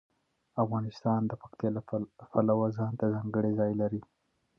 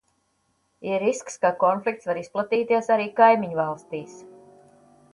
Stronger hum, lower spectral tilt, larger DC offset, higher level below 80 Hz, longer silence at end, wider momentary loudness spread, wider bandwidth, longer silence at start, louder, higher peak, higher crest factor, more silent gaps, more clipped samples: neither; first, -10.5 dB/octave vs -5 dB/octave; neither; about the same, -66 dBFS vs -70 dBFS; second, 0.55 s vs 0.85 s; second, 8 LU vs 17 LU; second, 6.2 kHz vs 11.5 kHz; second, 0.55 s vs 0.8 s; second, -32 LUFS vs -23 LUFS; second, -14 dBFS vs -4 dBFS; about the same, 18 dB vs 22 dB; neither; neither